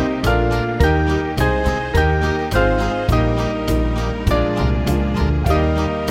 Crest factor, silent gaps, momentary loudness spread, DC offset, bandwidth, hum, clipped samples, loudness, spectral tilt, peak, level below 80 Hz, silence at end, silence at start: 14 dB; none; 3 LU; under 0.1%; 16.5 kHz; none; under 0.1%; -18 LUFS; -7 dB/octave; -2 dBFS; -22 dBFS; 0 s; 0 s